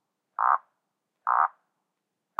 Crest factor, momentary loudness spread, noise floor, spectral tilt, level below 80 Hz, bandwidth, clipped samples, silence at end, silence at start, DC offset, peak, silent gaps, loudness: 22 dB; 10 LU; -82 dBFS; -2.5 dB/octave; under -90 dBFS; 3.4 kHz; under 0.1%; 0.9 s; 0.4 s; under 0.1%; -8 dBFS; none; -27 LUFS